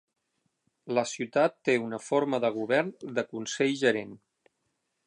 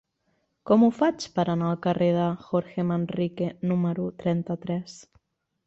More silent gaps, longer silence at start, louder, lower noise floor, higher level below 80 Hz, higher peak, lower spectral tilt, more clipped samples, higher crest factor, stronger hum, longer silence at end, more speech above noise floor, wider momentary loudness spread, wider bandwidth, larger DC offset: neither; first, 0.85 s vs 0.65 s; about the same, -28 LUFS vs -26 LUFS; first, -79 dBFS vs -73 dBFS; second, -80 dBFS vs -64 dBFS; about the same, -10 dBFS vs -8 dBFS; second, -4.5 dB/octave vs -7.5 dB/octave; neither; about the same, 20 dB vs 18 dB; neither; first, 0.9 s vs 0.65 s; about the same, 51 dB vs 48 dB; about the same, 8 LU vs 9 LU; first, 11 kHz vs 8 kHz; neither